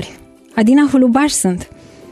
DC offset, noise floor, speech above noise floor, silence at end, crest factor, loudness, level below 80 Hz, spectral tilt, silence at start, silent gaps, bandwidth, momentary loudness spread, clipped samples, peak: under 0.1%; -39 dBFS; 27 dB; 0.5 s; 12 dB; -13 LUFS; -46 dBFS; -4.5 dB/octave; 0 s; none; 15 kHz; 14 LU; under 0.1%; -2 dBFS